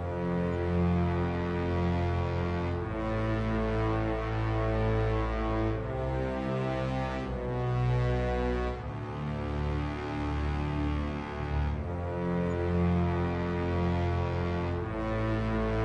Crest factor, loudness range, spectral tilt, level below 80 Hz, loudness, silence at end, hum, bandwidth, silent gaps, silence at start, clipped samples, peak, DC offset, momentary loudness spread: 12 dB; 2 LU; -8.5 dB/octave; -38 dBFS; -31 LUFS; 0 s; none; 8.4 kHz; none; 0 s; under 0.1%; -18 dBFS; under 0.1%; 5 LU